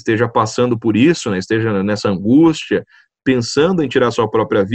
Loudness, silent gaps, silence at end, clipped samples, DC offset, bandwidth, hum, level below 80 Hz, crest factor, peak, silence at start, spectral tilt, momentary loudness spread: -15 LUFS; none; 0 s; under 0.1%; under 0.1%; 8.8 kHz; none; -50 dBFS; 14 dB; 0 dBFS; 0.05 s; -6 dB/octave; 7 LU